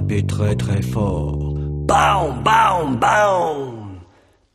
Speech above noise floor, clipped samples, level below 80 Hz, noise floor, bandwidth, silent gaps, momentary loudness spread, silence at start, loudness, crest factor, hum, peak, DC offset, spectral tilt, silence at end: 36 dB; under 0.1%; -34 dBFS; -53 dBFS; 14 kHz; none; 10 LU; 0 s; -18 LUFS; 16 dB; none; -2 dBFS; under 0.1%; -6 dB/octave; 0.5 s